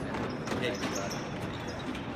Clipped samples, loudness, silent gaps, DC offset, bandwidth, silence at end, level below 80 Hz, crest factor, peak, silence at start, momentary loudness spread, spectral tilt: under 0.1%; -35 LUFS; none; under 0.1%; 15.5 kHz; 0 s; -52 dBFS; 16 dB; -18 dBFS; 0 s; 5 LU; -4.5 dB/octave